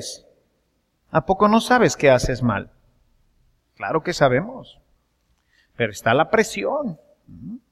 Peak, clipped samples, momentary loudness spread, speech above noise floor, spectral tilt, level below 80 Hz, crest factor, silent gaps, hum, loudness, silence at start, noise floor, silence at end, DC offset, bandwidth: -2 dBFS; under 0.1%; 22 LU; 48 dB; -5 dB/octave; -44 dBFS; 20 dB; none; none; -20 LUFS; 0 s; -68 dBFS; 0.15 s; under 0.1%; 14.5 kHz